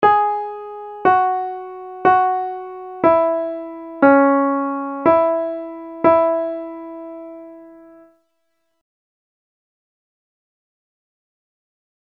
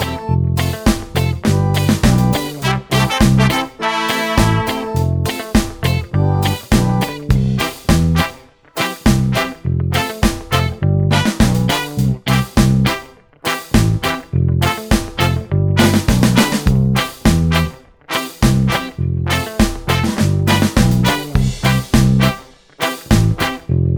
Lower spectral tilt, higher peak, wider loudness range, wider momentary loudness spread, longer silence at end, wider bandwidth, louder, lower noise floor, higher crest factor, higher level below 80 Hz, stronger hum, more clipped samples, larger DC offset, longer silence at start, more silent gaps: first, -8.5 dB/octave vs -5.5 dB/octave; about the same, 0 dBFS vs 0 dBFS; first, 6 LU vs 2 LU; first, 18 LU vs 6 LU; first, 4.25 s vs 0 s; second, 5.2 kHz vs over 20 kHz; about the same, -17 LUFS vs -16 LUFS; first, -72 dBFS vs -36 dBFS; first, 20 dB vs 14 dB; second, -60 dBFS vs -26 dBFS; neither; neither; neither; about the same, 0 s vs 0 s; neither